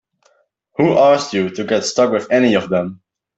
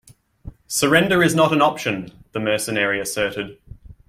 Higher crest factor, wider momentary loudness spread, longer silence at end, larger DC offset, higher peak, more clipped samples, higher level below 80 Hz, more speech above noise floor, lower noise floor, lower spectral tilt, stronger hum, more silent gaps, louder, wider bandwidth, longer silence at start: about the same, 14 dB vs 18 dB; second, 8 LU vs 14 LU; first, 0.45 s vs 0.15 s; neither; about the same, -2 dBFS vs -2 dBFS; neither; second, -58 dBFS vs -48 dBFS; first, 44 dB vs 22 dB; first, -59 dBFS vs -41 dBFS; about the same, -5 dB/octave vs -4 dB/octave; neither; neither; first, -15 LUFS vs -19 LUFS; second, 8.2 kHz vs 16.5 kHz; first, 0.8 s vs 0.45 s